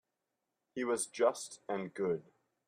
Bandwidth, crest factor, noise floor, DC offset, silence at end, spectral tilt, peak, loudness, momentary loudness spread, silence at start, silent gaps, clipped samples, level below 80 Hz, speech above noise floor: 15 kHz; 20 dB; -87 dBFS; under 0.1%; 0.45 s; -4 dB/octave; -18 dBFS; -36 LUFS; 10 LU; 0.75 s; none; under 0.1%; -80 dBFS; 52 dB